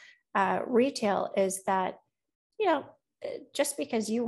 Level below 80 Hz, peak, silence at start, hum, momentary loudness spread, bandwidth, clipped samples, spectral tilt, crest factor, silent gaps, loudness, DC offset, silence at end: -78 dBFS; -12 dBFS; 0.35 s; none; 10 LU; 13 kHz; under 0.1%; -4 dB/octave; 18 dB; 2.35-2.50 s; -29 LUFS; under 0.1%; 0 s